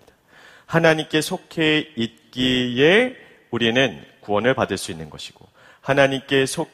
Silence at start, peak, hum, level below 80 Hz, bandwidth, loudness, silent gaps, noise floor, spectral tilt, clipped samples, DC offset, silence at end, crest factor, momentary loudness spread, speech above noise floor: 0.7 s; 0 dBFS; none; -54 dBFS; 15.5 kHz; -20 LUFS; none; -50 dBFS; -4.5 dB/octave; under 0.1%; under 0.1%; 0.05 s; 20 dB; 15 LU; 30 dB